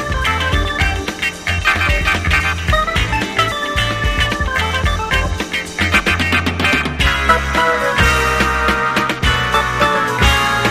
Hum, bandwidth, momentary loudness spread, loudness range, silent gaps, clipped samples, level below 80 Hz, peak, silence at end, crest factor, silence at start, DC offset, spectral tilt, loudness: none; 15.5 kHz; 4 LU; 2 LU; none; under 0.1%; -24 dBFS; 0 dBFS; 0 s; 16 dB; 0 s; under 0.1%; -4 dB/octave; -15 LUFS